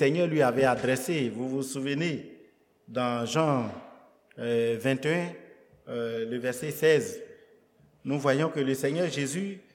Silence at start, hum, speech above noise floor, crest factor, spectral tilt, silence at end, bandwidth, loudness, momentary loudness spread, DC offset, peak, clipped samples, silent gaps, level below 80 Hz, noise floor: 0 s; none; 34 dB; 20 dB; -5.5 dB/octave; 0.15 s; 18 kHz; -28 LUFS; 14 LU; under 0.1%; -10 dBFS; under 0.1%; none; -70 dBFS; -62 dBFS